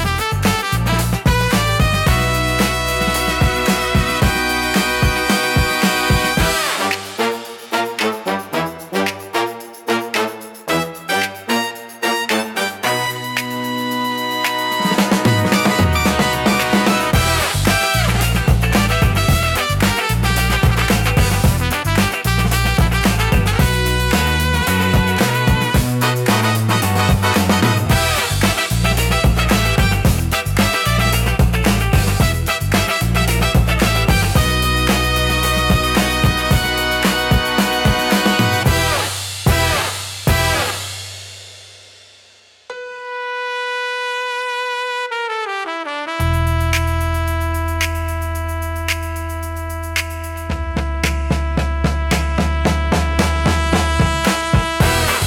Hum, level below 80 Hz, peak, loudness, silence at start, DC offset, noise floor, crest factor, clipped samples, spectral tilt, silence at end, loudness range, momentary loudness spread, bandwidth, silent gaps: none; -24 dBFS; -2 dBFS; -17 LUFS; 0 s; under 0.1%; -48 dBFS; 14 dB; under 0.1%; -4.5 dB/octave; 0 s; 6 LU; 7 LU; 18 kHz; none